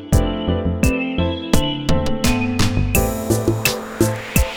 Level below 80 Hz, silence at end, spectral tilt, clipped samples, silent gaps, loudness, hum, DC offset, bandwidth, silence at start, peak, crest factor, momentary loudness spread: -26 dBFS; 0 s; -5 dB/octave; under 0.1%; none; -19 LUFS; none; under 0.1%; over 20 kHz; 0 s; 0 dBFS; 18 dB; 3 LU